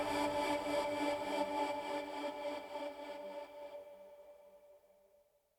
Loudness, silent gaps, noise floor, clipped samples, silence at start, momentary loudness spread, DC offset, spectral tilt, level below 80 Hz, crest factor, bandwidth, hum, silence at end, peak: -40 LUFS; none; -72 dBFS; under 0.1%; 0 s; 20 LU; under 0.1%; -3.5 dB/octave; -70 dBFS; 18 dB; over 20 kHz; none; 0.8 s; -24 dBFS